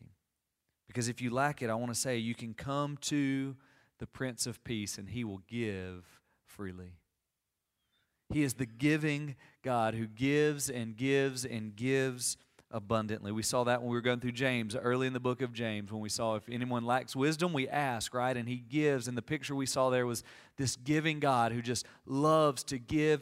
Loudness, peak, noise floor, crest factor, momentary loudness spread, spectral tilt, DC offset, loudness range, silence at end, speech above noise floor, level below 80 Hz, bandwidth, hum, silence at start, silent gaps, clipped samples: -33 LUFS; -14 dBFS; -87 dBFS; 20 dB; 11 LU; -4.5 dB/octave; under 0.1%; 8 LU; 0 s; 53 dB; -66 dBFS; 16 kHz; none; 0.9 s; none; under 0.1%